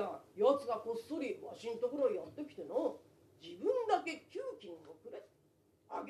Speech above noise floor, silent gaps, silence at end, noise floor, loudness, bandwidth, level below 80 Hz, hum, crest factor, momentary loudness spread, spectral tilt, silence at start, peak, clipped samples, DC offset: 34 dB; none; 0 s; -72 dBFS; -38 LUFS; 13 kHz; -82 dBFS; none; 20 dB; 19 LU; -5 dB/octave; 0 s; -20 dBFS; under 0.1%; under 0.1%